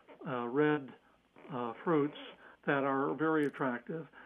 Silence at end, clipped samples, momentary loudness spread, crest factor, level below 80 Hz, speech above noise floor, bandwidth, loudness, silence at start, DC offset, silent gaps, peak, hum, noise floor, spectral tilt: 0 s; under 0.1%; 13 LU; 18 dB; -82 dBFS; 29 dB; 10.5 kHz; -34 LUFS; 0.1 s; under 0.1%; none; -18 dBFS; none; -62 dBFS; -8 dB/octave